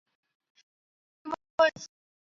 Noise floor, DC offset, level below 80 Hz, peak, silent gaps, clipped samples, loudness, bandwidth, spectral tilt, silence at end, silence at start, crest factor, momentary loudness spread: under -90 dBFS; under 0.1%; -74 dBFS; -10 dBFS; 1.50-1.58 s; under 0.1%; -28 LUFS; 7.4 kHz; -0.5 dB/octave; 0.4 s; 1.25 s; 24 dB; 21 LU